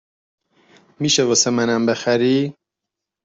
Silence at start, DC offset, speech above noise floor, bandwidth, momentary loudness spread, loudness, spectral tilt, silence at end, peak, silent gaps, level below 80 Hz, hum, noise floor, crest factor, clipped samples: 1 s; under 0.1%; 66 dB; 8.2 kHz; 7 LU; -18 LUFS; -3.5 dB/octave; 0.7 s; -2 dBFS; none; -62 dBFS; none; -83 dBFS; 18 dB; under 0.1%